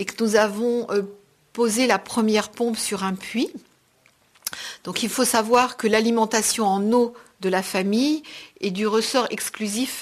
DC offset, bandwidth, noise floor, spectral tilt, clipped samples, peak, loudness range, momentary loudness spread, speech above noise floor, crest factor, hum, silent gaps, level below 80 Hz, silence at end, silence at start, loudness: under 0.1%; 14 kHz; -60 dBFS; -3.5 dB/octave; under 0.1%; -4 dBFS; 4 LU; 10 LU; 38 dB; 18 dB; none; none; -64 dBFS; 0 s; 0 s; -22 LUFS